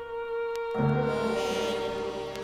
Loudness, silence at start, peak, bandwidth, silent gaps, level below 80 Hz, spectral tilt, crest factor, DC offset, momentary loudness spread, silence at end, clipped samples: -30 LUFS; 0 s; -14 dBFS; 15.5 kHz; none; -54 dBFS; -6 dB/octave; 16 dB; under 0.1%; 7 LU; 0 s; under 0.1%